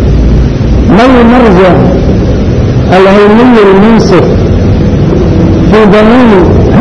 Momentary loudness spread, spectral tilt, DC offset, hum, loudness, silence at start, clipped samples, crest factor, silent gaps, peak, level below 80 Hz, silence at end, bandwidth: 5 LU; -8 dB/octave; under 0.1%; none; -4 LUFS; 0 s; 10%; 2 dB; none; 0 dBFS; -12 dBFS; 0 s; 9.6 kHz